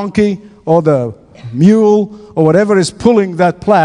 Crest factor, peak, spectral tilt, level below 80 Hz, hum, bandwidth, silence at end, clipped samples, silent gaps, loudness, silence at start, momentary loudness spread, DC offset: 12 dB; 0 dBFS; -7 dB/octave; -46 dBFS; none; 10.5 kHz; 0 s; 0.4%; none; -11 LUFS; 0 s; 13 LU; under 0.1%